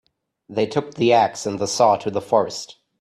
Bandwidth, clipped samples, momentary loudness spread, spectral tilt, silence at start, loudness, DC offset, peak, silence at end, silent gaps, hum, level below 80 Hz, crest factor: 13 kHz; under 0.1%; 12 LU; -4.5 dB/octave; 0.5 s; -20 LUFS; under 0.1%; -2 dBFS; 0.3 s; none; none; -62 dBFS; 18 dB